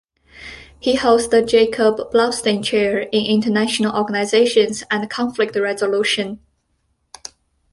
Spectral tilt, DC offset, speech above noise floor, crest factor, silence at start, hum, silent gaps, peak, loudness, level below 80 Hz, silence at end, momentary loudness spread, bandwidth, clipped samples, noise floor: -4 dB/octave; under 0.1%; 50 dB; 16 dB; 0.35 s; none; none; -2 dBFS; -17 LUFS; -52 dBFS; 1.35 s; 21 LU; 11.5 kHz; under 0.1%; -67 dBFS